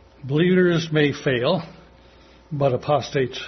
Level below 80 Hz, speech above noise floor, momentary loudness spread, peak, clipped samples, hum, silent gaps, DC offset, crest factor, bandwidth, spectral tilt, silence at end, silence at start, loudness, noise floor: -54 dBFS; 29 dB; 9 LU; -6 dBFS; under 0.1%; none; none; under 0.1%; 16 dB; 6.4 kHz; -6.5 dB/octave; 0 s; 0.25 s; -21 LUFS; -50 dBFS